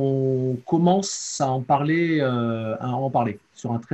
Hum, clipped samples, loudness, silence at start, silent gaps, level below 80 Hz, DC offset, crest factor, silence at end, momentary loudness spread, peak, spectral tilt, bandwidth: none; under 0.1%; -23 LUFS; 0 s; none; -64 dBFS; under 0.1%; 16 dB; 0.1 s; 8 LU; -6 dBFS; -6 dB/octave; 8.8 kHz